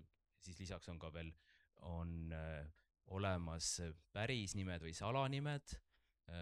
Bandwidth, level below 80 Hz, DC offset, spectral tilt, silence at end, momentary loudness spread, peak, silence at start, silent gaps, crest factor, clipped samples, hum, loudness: 13.5 kHz; -60 dBFS; under 0.1%; -4.5 dB/octave; 0 s; 15 LU; -26 dBFS; 0 s; none; 20 dB; under 0.1%; none; -46 LUFS